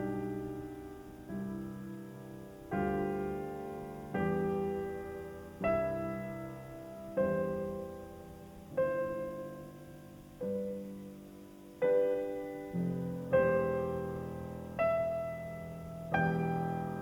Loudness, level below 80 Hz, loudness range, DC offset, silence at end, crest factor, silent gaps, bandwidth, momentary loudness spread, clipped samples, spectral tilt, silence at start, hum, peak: -36 LUFS; -58 dBFS; 6 LU; under 0.1%; 0 s; 20 dB; none; 19 kHz; 17 LU; under 0.1%; -8 dB/octave; 0 s; none; -16 dBFS